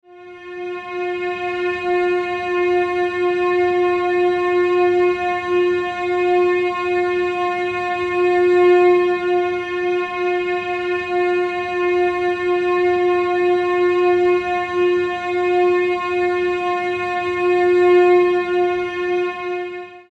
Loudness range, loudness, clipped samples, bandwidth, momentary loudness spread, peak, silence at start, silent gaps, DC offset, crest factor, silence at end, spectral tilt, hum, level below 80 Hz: 3 LU; -18 LUFS; under 0.1%; 8 kHz; 7 LU; -6 dBFS; 0.1 s; none; under 0.1%; 12 dB; 0.15 s; -5.5 dB/octave; none; -56 dBFS